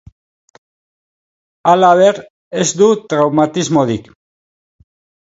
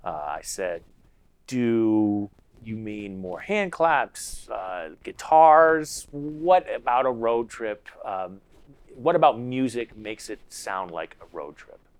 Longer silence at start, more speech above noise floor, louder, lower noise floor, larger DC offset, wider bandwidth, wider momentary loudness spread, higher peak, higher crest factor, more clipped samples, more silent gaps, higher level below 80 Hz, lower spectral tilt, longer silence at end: first, 1.65 s vs 0.05 s; first, over 78 dB vs 34 dB; first, -13 LUFS vs -24 LUFS; first, under -90 dBFS vs -58 dBFS; neither; second, 8 kHz vs 15.5 kHz; second, 11 LU vs 18 LU; first, 0 dBFS vs -4 dBFS; second, 16 dB vs 22 dB; neither; first, 2.30-2.51 s vs none; about the same, -54 dBFS vs -56 dBFS; about the same, -5 dB/octave vs -5 dB/octave; first, 1.3 s vs 0.35 s